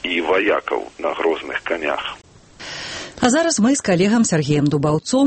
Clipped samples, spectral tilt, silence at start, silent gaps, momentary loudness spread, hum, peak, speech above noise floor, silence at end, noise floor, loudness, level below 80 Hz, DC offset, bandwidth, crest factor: under 0.1%; -4.5 dB/octave; 0.05 s; none; 14 LU; none; -4 dBFS; 21 dB; 0 s; -38 dBFS; -19 LUFS; -50 dBFS; under 0.1%; 8.8 kHz; 16 dB